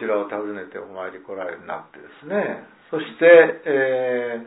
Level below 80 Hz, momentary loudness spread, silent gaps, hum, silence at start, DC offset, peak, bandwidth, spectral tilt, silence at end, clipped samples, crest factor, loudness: -74 dBFS; 21 LU; none; none; 0 s; under 0.1%; 0 dBFS; 4 kHz; -9 dB/octave; 0 s; under 0.1%; 20 dB; -19 LUFS